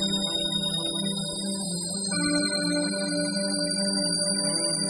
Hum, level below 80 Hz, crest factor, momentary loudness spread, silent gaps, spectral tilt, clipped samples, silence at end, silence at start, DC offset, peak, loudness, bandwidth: none; -60 dBFS; 12 dB; 5 LU; none; -2.5 dB/octave; under 0.1%; 0 s; 0 s; under 0.1%; -14 dBFS; -25 LUFS; 11.5 kHz